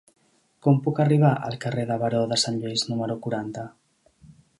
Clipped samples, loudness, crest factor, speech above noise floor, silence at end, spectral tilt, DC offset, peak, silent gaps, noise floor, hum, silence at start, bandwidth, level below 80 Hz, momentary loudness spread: under 0.1%; -24 LUFS; 18 dB; 31 dB; 0.9 s; -5.5 dB/octave; under 0.1%; -6 dBFS; none; -54 dBFS; none; 0.65 s; 11.5 kHz; -64 dBFS; 11 LU